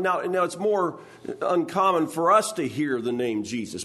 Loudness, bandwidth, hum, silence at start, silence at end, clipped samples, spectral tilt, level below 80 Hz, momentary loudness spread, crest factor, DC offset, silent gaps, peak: -24 LUFS; 12.5 kHz; none; 0 s; 0 s; under 0.1%; -5 dB/octave; -70 dBFS; 10 LU; 18 dB; under 0.1%; none; -8 dBFS